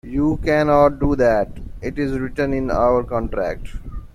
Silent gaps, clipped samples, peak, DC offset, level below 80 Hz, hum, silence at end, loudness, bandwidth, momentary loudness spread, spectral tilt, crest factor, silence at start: none; under 0.1%; -2 dBFS; under 0.1%; -32 dBFS; none; 0.05 s; -19 LUFS; 12.5 kHz; 14 LU; -8 dB/octave; 16 dB; 0.05 s